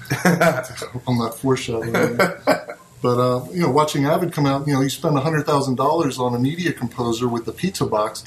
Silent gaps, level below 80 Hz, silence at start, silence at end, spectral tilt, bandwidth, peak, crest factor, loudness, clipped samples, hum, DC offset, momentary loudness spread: none; -54 dBFS; 0 s; 0 s; -5.5 dB/octave; 13.5 kHz; 0 dBFS; 20 dB; -20 LUFS; under 0.1%; none; under 0.1%; 6 LU